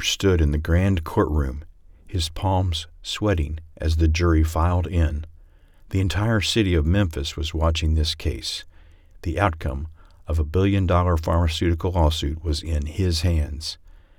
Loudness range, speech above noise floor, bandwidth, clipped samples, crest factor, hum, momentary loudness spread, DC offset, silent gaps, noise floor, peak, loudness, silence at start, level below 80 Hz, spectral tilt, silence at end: 3 LU; 28 dB; 15 kHz; under 0.1%; 18 dB; none; 10 LU; under 0.1%; none; -49 dBFS; -4 dBFS; -23 LUFS; 0 s; -30 dBFS; -6 dB/octave; 0.25 s